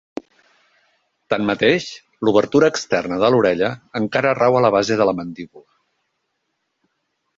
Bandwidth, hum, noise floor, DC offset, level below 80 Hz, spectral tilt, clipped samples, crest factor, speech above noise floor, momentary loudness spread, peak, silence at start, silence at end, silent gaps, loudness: 7.8 kHz; none; -73 dBFS; under 0.1%; -56 dBFS; -5.5 dB/octave; under 0.1%; 18 dB; 56 dB; 17 LU; -2 dBFS; 1.3 s; 1.8 s; none; -18 LUFS